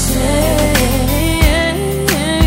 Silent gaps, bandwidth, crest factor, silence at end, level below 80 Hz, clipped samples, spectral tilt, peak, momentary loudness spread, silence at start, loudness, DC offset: none; 16.5 kHz; 12 dB; 0 s; -18 dBFS; under 0.1%; -4.5 dB/octave; 0 dBFS; 3 LU; 0 s; -14 LUFS; under 0.1%